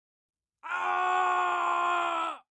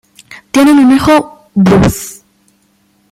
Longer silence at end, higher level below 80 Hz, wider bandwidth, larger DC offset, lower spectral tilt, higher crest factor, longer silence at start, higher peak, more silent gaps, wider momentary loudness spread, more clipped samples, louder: second, 0.15 s vs 1 s; second, -88 dBFS vs -34 dBFS; second, 10 kHz vs 16 kHz; neither; second, -1.5 dB/octave vs -6 dB/octave; about the same, 12 dB vs 10 dB; first, 0.65 s vs 0.3 s; second, -18 dBFS vs 0 dBFS; neither; second, 7 LU vs 13 LU; neither; second, -28 LUFS vs -9 LUFS